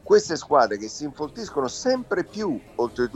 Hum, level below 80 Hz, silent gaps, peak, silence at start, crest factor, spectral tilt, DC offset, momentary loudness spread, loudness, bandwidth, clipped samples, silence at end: none; -56 dBFS; none; -4 dBFS; 0.05 s; 20 dB; -4 dB/octave; under 0.1%; 11 LU; -25 LUFS; 8.8 kHz; under 0.1%; 0.05 s